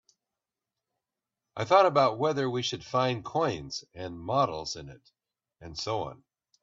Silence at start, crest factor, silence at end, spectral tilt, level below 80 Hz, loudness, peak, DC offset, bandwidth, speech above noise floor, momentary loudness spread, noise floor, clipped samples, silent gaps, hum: 1.55 s; 22 dB; 0.5 s; -5 dB/octave; -62 dBFS; -28 LUFS; -8 dBFS; under 0.1%; 7.8 kHz; 61 dB; 18 LU; -89 dBFS; under 0.1%; none; none